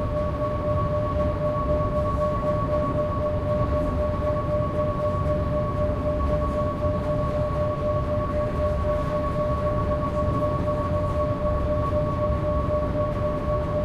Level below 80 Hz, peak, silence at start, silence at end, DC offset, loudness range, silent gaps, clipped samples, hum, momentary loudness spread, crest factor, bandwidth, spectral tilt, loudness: -32 dBFS; -12 dBFS; 0 s; 0 s; under 0.1%; 1 LU; none; under 0.1%; none; 1 LU; 12 dB; 11 kHz; -9 dB/octave; -25 LUFS